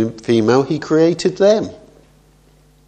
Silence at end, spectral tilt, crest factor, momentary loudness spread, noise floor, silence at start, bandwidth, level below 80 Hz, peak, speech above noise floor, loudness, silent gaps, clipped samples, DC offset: 1.15 s; -6 dB/octave; 16 dB; 4 LU; -51 dBFS; 0 s; 9.2 kHz; -54 dBFS; 0 dBFS; 36 dB; -15 LUFS; none; under 0.1%; under 0.1%